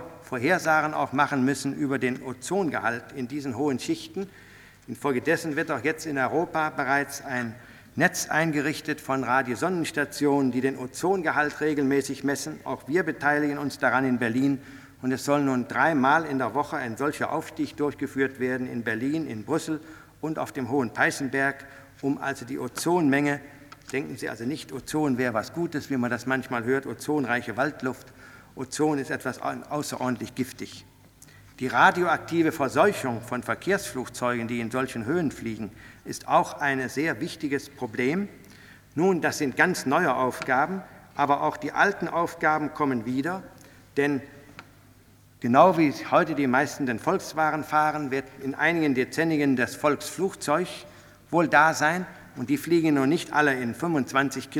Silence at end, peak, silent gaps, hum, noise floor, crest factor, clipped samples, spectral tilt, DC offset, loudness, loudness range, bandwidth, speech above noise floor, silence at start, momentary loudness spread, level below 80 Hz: 0 s; -4 dBFS; none; none; -55 dBFS; 22 dB; under 0.1%; -5 dB/octave; under 0.1%; -26 LUFS; 5 LU; 19 kHz; 29 dB; 0 s; 11 LU; -62 dBFS